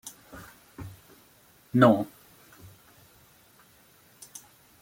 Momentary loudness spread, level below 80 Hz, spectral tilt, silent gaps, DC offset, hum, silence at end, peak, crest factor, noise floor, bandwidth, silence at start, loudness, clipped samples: 27 LU; -64 dBFS; -6.5 dB/octave; none; under 0.1%; none; 2.75 s; -6 dBFS; 26 dB; -59 dBFS; 16.5 kHz; 0.05 s; -23 LUFS; under 0.1%